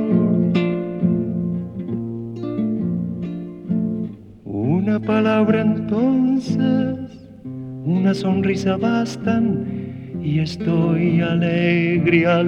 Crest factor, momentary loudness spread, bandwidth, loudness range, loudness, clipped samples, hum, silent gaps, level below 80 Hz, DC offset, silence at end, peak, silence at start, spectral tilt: 16 dB; 12 LU; 7.8 kHz; 5 LU; -20 LUFS; under 0.1%; none; none; -52 dBFS; under 0.1%; 0 s; -4 dBFS; 0 s; -8 dB/octave